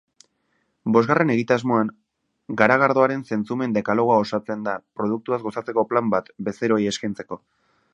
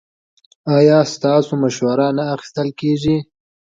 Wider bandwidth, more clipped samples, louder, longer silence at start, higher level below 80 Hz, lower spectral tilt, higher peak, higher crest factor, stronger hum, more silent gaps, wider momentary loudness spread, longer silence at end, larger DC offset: first, 8.8 kHz vs 7.8 kHz; neither; second, -22 LUFS vs -16 LUFS; first, 0.85 s vs 0.65 s; second, -64 dBFS vs -52 dBFS; about the same, -6.5 dB/octave vs -6.5 dB/octave; about the same, 0 dBFS vs 0 dBFS; first, 22 dB vs 16 dB; neither; neither; about the same, 12 LU vs 10 LU; about the same, 0.55 s vs 0.45 s; neither